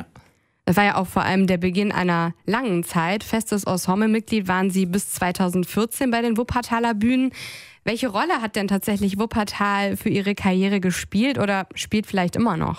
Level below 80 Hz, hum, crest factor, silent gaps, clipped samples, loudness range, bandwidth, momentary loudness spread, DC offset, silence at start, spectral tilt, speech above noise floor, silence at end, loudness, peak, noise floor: -48 dBFS; none; 16 dB; none; under 0.1%; 1 LU; 16 kHz; 4 LU; under 0.1%; 0 s; -5.5 dB/octave; 33 dB; 0 s; -22 LUFS; -6 dBFS; -55 dBFS